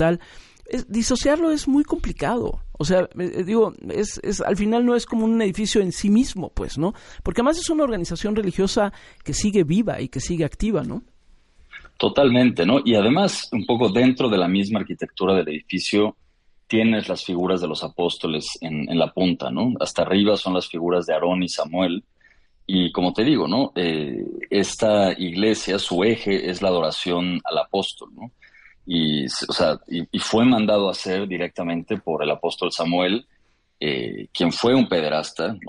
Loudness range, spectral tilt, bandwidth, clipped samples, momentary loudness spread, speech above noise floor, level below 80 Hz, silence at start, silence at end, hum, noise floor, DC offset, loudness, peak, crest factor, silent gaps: 4 LU; -5 dB/octave; 11.5 kHz; under 0.1%; 9 LU; 35 dB; -42 dBFS; 0 s; 0 s; none; -56 dBFS; under 0.1%; -22 LUFS; -6 dBFS; 16 dB; none